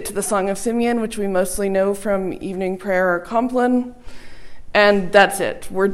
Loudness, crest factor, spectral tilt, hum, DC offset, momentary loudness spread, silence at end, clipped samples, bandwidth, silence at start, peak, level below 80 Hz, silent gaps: -19 LUFS; 18 dB; -4.5 dB/octave; none; under 0.1%; 10 LU; 0 s; under 0.1%; 16 kHz; 0 s; 0 dBFS; -44 dBFS; none